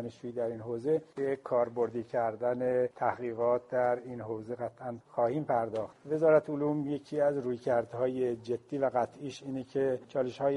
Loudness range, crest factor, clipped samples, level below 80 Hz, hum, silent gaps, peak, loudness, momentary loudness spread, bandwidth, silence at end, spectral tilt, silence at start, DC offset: 2 LU; 20 dB; under 0.1%; -72 dBFS; none; none; -12 dBFS; -32 LUFS; 9 LU; 11 kHz; 0 s; -7.5 dB/octave; 0 s; under 0.1%